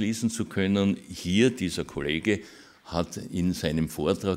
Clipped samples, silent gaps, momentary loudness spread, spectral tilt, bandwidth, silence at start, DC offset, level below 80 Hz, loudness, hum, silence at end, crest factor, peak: under 0.1%; none; 9 LU; -5.5 dB/octave; 16 kHz; 0 s; under 0.1%; -50 dBFS; -27 LUFS; none; 0 s; 18 dB; -10 dBFS